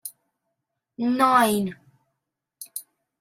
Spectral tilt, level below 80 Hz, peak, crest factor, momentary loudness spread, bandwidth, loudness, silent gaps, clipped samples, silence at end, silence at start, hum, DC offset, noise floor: -4 dB/octave; -66 dBFS; -6 dBFS; 20 dB; 20 LU; 16 kHz; -21 LUFS; none; under 0.1%; 0.4 s; 0.05 s; none; under 0.1%; -82 dBFS